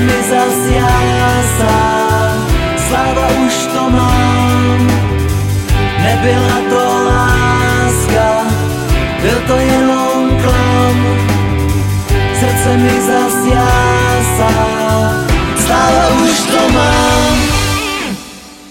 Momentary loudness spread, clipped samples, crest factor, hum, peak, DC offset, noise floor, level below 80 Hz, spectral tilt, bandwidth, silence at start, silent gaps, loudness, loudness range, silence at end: 4 LU; under 0.1%; 10 dB; none; 0 dBFS; under 0.1%; -31 dBFS; -20 dBFS; -5 dB/octave; 17 kHz; 0 s; none; -11 LUFS; 1 LU; 0 s